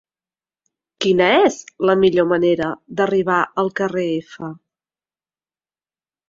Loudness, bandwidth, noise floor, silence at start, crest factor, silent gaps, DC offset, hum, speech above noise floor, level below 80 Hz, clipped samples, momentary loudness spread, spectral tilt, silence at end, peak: -18 LUFS; 7.6 kHz; under -90 dBFS; 1 s; 18 dB; none; under 0.1%; none; over 73 dB; -58 dBFS; under 0.1%; 11 LU; -5.5 dB/octave; 1.75 s; -2 dBFS